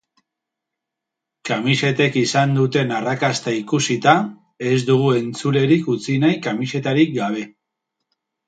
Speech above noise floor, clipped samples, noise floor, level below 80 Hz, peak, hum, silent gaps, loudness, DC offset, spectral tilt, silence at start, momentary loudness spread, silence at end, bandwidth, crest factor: 65 dB; under 0.1%; -83 dBFS; -62 dBFS; 0 dBFS; none; none; -19 LUFS; under 0.1%; -5.5 dB/octave; 1.45 s; 8 LU; 1 s; 9.2 kHz; 20 dB